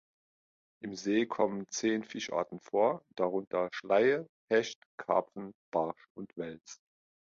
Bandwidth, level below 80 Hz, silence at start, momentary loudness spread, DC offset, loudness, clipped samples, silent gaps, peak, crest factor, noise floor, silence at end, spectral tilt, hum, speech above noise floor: 7.6 kHz; -76 dBFS; 0.85 s; 16 LU; under 0.1%; -33 LUFS; under 0.1%; 3.47-3.51 s, 4.29-4.48 s, 4.75-4.98 s, 5.55-5.72 s, 6.10-6.15 s; -12 dBFS; 20 dB; under -90 dBFS; 0.65 s; -4.5 dB/octave; none; over 57 dB